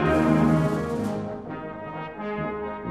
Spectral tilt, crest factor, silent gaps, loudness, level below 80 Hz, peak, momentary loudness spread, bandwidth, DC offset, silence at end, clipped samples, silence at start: -8 dB/octave; 16 dB; none; -26 LUFS; -44 dBFS; -8 dBFS; 15 LU; 13 kHz; under 0.1%; 0 s; under 0.1%; 0 s